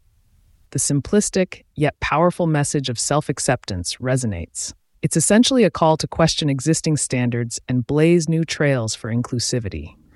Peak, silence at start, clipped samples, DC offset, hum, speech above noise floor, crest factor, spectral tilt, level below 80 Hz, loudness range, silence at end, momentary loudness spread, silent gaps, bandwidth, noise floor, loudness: -4 dBFS; 0.7 s; under 0.1%; under 0.1%; none; 37 dB; 16 dB; -4.5 dB/octave; -44 dBFS; 3 LU; 0.25 s; 10 LU; none; 12 kHz; -56 dBFS; -20 LUFS